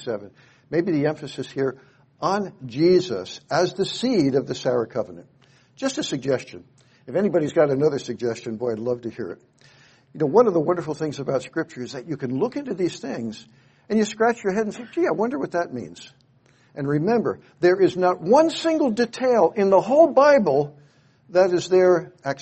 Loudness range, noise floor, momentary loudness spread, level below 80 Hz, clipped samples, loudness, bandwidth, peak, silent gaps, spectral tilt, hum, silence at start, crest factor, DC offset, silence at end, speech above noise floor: 7 LU; -58 dBFS; 14 LU; -64 dBFS; under 0.1%; -22 LUFS; 8.4 kHz; -4 dBFS; none; -6 dB/octave; none; 0 s; 20 dB; under 0.1%; 0 s; 36 dB